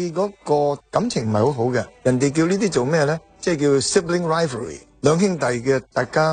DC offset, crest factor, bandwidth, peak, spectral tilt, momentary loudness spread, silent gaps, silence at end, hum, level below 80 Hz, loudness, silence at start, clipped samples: under 0.1%; 16 dB; 9.6 kHz; -4 dBFS; -5.5 dB/octave; 6 LU; none; 0 s; none; -52 dBFS; -20 LUFS; 0 s; under 0.1%